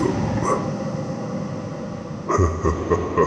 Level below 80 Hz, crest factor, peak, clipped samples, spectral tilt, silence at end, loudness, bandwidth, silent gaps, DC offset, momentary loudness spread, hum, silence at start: -36 dBFS; 16 dB; -6 dBFS; under 0.1%; -7 dB/octave; 0 s; -24 LUFS; 10 kHz; none; under 0.1%; 10 LU; none; 0 s